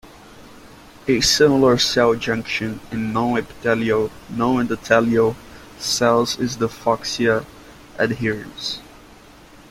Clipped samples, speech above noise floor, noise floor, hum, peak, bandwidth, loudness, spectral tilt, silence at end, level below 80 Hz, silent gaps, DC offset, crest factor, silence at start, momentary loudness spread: under 0.1%; 26 dB; -45 dBFS; none; -2 dBFS; 16.5 kHz; -19 LUFS; -4 dB/octave; 0.85 s; -48 dBFS; none; under 0.1%; 18 dB; 0.05 s; 12 LU